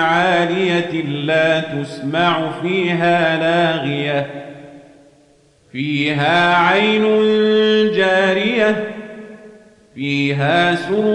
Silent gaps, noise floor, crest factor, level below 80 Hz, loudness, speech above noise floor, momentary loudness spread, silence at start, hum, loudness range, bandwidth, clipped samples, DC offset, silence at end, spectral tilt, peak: none; -52 dBFS; 12 dB; -60 dBFS; -16 LUFS; 37 dB; 12 LU; 0 s; none; 5 LU; 10.5 kHz; under 0.1%; under 0.1%; 0 s; -6 dB/octave; -4 dBFS